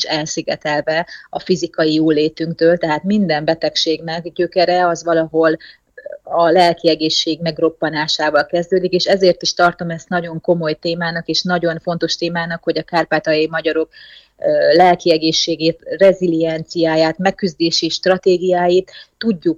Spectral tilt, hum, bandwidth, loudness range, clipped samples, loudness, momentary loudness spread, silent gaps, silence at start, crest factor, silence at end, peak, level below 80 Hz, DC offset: -4.5 dB/octave; none; 9.2 kHz; 3 LU; under 0.1%; -16 LUFS; 8 LU; none; 0 s; 14 dB; 0 s; -2 dBFS; -54 dBFS; under 0.1%